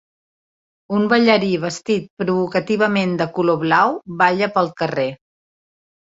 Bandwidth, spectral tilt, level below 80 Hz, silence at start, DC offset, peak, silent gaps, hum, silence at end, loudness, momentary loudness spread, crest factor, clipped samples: 7.8 kHz; -6 dB/octave; -60 dBFS; 0.9 s; under 0.1%; -2 dBFS; 2.10-2.17 s; none; 1 s; -18 LUFS; 7 LU; 18 dB; under 0.1%